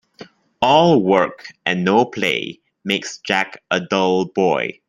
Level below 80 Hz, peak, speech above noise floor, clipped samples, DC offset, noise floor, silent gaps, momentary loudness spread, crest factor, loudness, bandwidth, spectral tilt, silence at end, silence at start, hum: -60 dBFS; 0 dBFS; 25 dB; under 0.1%; under 0.1%; -43 dBFS; none; 10 LU; 18 dB; -18 LUFS; 14.5 kHz; -5 dB/octave; 0.15 s; 0.2 s; none